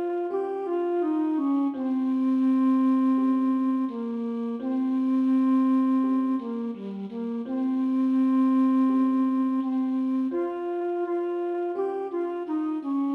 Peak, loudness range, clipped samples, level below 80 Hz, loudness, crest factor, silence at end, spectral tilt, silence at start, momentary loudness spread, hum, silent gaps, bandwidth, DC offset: -16 dBFS; 3 LU; under 0.1%; -74 dBFS; -25 LUFS; 8 dB; 0 s; -8.5 dB/octave; 0 s; 8 LU; none; none; 4.1 kHz; under 0.1%